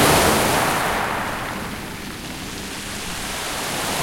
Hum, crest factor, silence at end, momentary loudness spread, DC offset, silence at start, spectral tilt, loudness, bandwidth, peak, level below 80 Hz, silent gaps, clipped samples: none; 20 dB; 0 s; 14 LU; under 0.1%; 0 s; -3 dB/octave; -22 LUFS; 16.5 kHz; -2 dBFS; -40 dBFS; none; under 0.1%